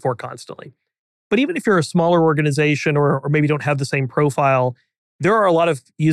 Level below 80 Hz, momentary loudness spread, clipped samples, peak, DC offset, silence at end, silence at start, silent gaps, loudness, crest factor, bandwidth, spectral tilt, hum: -62 dBFS; 9 LU; under 0.1%; -6 dBFS; under 0.1%; 0 s; 0.05 s; 0.99-1.30 s, 4.98-5.19 s; -18 LUFS; 12 dB; 12.5 kHz; -6.5 dB/octave; none